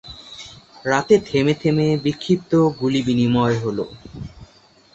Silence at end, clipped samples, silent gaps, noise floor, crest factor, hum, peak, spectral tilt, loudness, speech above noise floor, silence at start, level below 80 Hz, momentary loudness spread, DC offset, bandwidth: 0.5 s; under 0.1%; none; -52 dBFS; 18 dB; none; -2 dBFS; -6.5 dB/octave; -19 LUFS; 33 dB; 0.05 s; -50 dBFS; 20 LU; under 0.1%; 8.2 kHz